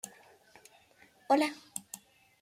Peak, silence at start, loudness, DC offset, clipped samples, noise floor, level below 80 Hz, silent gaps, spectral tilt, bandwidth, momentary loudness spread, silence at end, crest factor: -14 dBFS; 0.05 s; -32 LUFS; under 0.1%; under 0.1%; -63 dBFS; -84 dBFS; none; -2.5 dB/octave; 16 kHz; 20 LU; 0.45 s; 24 dB